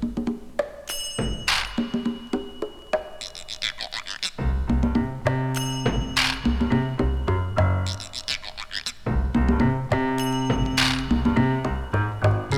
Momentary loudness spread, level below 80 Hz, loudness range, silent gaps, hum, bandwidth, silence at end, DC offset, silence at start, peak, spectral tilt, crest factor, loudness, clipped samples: 9 LU; -32 dBFS; 5 LU; none; none; 16.5 kHz; 0 s; under 0.1%; 0 s; -6 dBFS; -5 dB/octave; 20 dB; -25 LUFS; under 0.1%